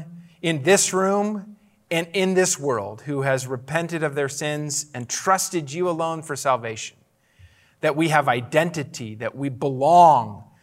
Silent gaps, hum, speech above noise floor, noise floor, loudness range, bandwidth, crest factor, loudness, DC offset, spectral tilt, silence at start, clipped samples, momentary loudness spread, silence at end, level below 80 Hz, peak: none; none; 32 dB; -54 dBFS; 5 LU; 16 kHz; 20 dB; -22 LUFS; under 0.1%; -4 dB/octave; 0 s; under 0.1%; 13 LU; 0.2 s; -70 dBFS; -2 dBFS